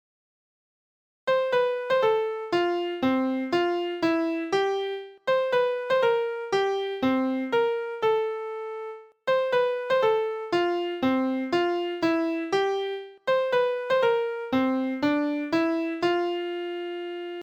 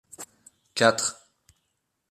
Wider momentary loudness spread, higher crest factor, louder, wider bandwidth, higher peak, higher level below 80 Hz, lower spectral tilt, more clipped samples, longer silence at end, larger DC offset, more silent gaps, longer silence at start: second, 9 LU vs 22 LU; second, 14 dB vs 26 dB; about the same, -26 LUFS vs -24 LUFS; second, 9.2 kHz vs 14.5 kHz; second, -12 dBFS vs -2 dBFS; first, -68 dBFS vs -74 dBFS; first, -5 dB/octave vs -2.5 dB/octave; neither; second, 0 s vs 0.95 s; neither; neither; first, 1.25 s vs 0.2 s